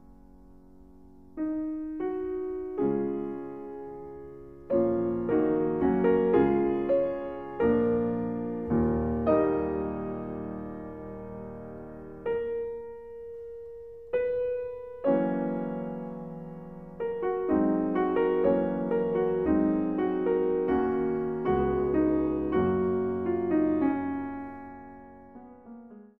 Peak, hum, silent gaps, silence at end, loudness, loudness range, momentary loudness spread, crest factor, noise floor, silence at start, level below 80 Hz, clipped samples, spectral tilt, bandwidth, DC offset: -10 dBFS; none; none; 0.1 s; -28 LUFS; 8 LU; 18 LU; 18 dB; -53 dBFS; 0.1 s; -50 dBFS; under 0.1%; -11 dB/octave; 4 kHz; 0.2%